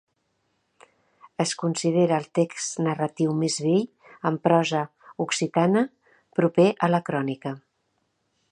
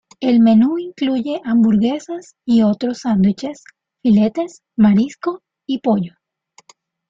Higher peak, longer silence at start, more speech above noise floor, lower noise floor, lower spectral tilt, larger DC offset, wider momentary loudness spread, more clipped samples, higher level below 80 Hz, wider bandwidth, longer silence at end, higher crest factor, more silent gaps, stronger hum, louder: about the same, -6 dBFS vs -4 dBFS; first, 1.4 s vs 0.2 s; first, 50 dB vs 38 dB; first, -73 dBFS vs -54 dBFS; second, -5.5 dB/octave vs -7.5 dB/octave; neither; about the same, 11 LU vs 12 LU; neither; second, -72 dBFS vs -54 dBFS; first, 11 kHz vs 7.6 kHz; about the same, 0.95 s vs 1 s; first, 20 dB vs 14 dB; neither; neither; second, -24 LUFS vs -17 LUFS